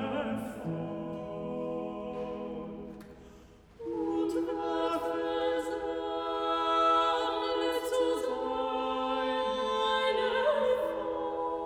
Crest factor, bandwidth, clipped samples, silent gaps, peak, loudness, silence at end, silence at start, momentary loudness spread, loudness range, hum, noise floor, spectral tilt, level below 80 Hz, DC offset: 16 dB; 17 kHz; under 0.1%; none; -16 dBFS; -31 LUFS; 0 s; 0 s; 11 LU; 9 LU; none; -55 dBFS; -5 dB/octave; -60 dBFS; under 0.1%